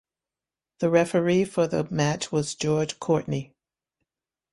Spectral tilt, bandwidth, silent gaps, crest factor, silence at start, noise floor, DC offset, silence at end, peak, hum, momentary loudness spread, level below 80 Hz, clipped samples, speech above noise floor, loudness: -5.5 dB/octave; 11.5 kHz; none; 20 dB; 0.8 s; under -90 dBFS; under 0.1%; 1.1 s; -6 dBFS; none; 6 LU; -60 dBFS; under 0.1%; over 66 dB; -25 LUFS